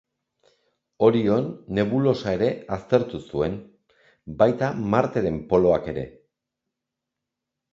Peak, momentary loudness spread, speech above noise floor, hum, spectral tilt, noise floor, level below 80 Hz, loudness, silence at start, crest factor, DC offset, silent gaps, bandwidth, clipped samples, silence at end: -2 dBFS; 12 LU; 62 dB; none; -8 dB/octave; -85 dBFS; -50 dBFS; -23 LUFS; 1 s; 22 dB; under 0.1%; none; 7.6 kHz; under 0.1%; 1.65 s